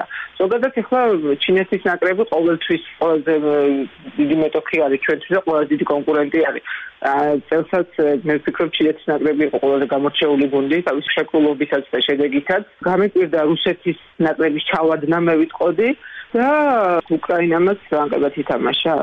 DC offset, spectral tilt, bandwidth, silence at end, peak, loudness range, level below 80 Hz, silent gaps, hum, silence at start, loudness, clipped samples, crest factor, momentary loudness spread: under 0.1%; -7.5 dB/octave; 5.6 kHz; 0 s; -8 dBFS; 1 LU; -58 dBFS; none; none; 0 s; -18 LUFS; under 0.1%; 10 dB; 4 LU